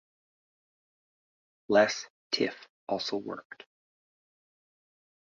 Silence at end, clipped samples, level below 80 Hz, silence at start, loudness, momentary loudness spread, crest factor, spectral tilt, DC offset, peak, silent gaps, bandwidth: 1.9 s; under 0.1%; -76 dBFS; 1.7 s; -29 LUFS; 21 LU; 24 dB; -2 dB/octave; under 0.1%; -12 dBFS; 2.10-2.30 s, 2.69-2.87 s; 7.4 kHz